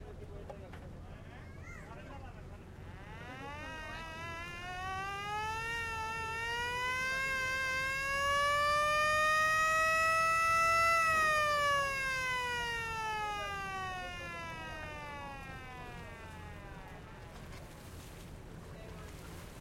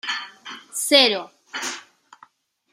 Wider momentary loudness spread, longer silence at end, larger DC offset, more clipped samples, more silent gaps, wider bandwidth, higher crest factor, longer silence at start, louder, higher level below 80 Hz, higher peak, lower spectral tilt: about the same, 22 LU vs 22 LU; second, 0 s vs 0.95 s; neither; neither; neither; about the same, 16.5 kHz vs 16 kHz; second, 16 dB vs 24 dB; about the same, 0 s vs 0.05 s; second, -32 LUFS vs -20 LUFS; first, -54 dBFS vs -80 dBFS; second, -20 dBFS vs -2 dBFS; first, -2.5 dB/octave vs -0.5 dB/octave